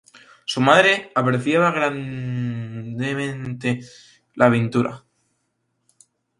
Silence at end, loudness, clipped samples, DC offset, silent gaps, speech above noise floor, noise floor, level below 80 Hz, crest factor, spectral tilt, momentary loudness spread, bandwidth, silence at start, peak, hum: 1.4 s; -20 LUFS; under 0.1%; under 0.1%; none; 52 dB; -72 dBFS; -60 dBFS; 22 dB; -5.5 dB/octave; 14 LU; 11.5 kHz; 0.15 s; 0 dBFS; none